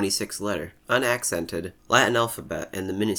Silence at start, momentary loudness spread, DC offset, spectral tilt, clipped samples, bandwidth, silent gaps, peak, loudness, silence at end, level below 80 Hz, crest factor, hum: 0 s; 12 LU; under 0.1%; -3 dB/octave; under 0.1%; over 20 kHz; none; -4 dBFS; -25 LUFS; 0 s; -56 dBFS; 22 dB; none